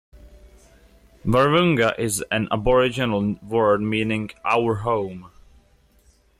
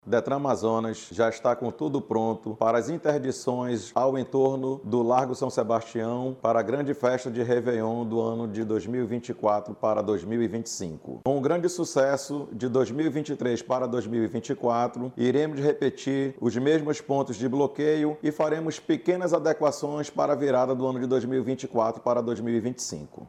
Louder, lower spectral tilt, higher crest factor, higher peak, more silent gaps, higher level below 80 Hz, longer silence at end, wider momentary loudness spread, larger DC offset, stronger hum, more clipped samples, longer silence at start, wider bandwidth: first, -21 LUFS vs -27 LUFS; about the same, -5 dB/octave vs -6 dB/octave; about the same, 16 dB vs 18 dB; about the same, -8 dBFS vs -8 dBFS; neither; first, -44 dBFS vs -68 dBFS; first, 1.1 s vs 0 s; first, 8 LU vs 5 LU; neither; neither; neither; about the same, 0.15 s vs 0.05 s; first, 15 kHz vs 13.5 kHz